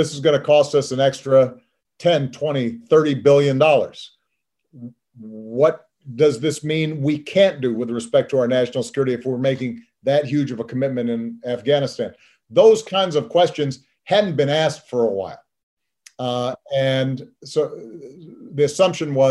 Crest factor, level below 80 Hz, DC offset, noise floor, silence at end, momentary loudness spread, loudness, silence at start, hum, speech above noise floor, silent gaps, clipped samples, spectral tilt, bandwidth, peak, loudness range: 18 dB; -66 dBFS; under 0.1%; -77 dBFS; 0 s; 14 LU; -19 LUFS; 0 s; none; 58 dB; 15.63-15.77 s; under 0.1%; -5.5 dB/octave; 12 kHz; -2 dBFS; 5 LU